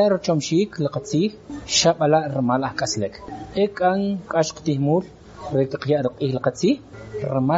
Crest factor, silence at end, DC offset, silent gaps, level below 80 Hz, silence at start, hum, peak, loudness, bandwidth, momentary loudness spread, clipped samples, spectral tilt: 18 dB; 0 s; under 0.1%; none; -52 dBFS; 0 s; none; -4 dBFS; -22 LUFS; 8 kHz; 11 LU; under 0.1%; -5 dB/octave